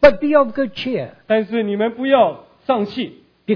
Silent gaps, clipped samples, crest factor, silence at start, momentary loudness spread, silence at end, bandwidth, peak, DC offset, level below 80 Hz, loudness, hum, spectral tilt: none; under 0.1%; 18 dB; 0 s; 12 LU; 0 s; 5.4 kHz; 0 dBFS; under 0.1%; -42 dBFS; -18 LUFS; none; -7.5 dB/octave